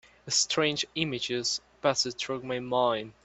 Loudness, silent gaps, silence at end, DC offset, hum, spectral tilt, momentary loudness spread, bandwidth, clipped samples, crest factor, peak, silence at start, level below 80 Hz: -28 LUFS; none; 0.15 s; under 0.1%; none; -2.5 dB/octave; 6 LU; 8.4 kHz; under 0.1%; 20 dB; -10 dBFS; 0.25 s; -66 dBFS